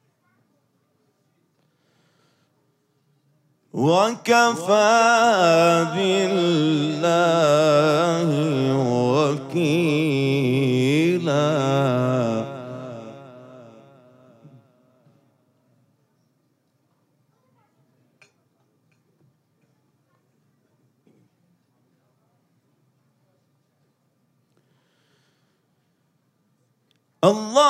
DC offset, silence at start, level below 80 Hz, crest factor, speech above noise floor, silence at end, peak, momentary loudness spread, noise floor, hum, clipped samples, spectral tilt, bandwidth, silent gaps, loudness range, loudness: under 0.1%; 3.75 s; -74 dBFS; 20 dB; 50 dB; 0 s; -4 dBFS; 9 LU; -68 dBFS; none; under 0.1%; -5.5 dB/octave; 15 kHz; none; 11 LU; -19 LUFS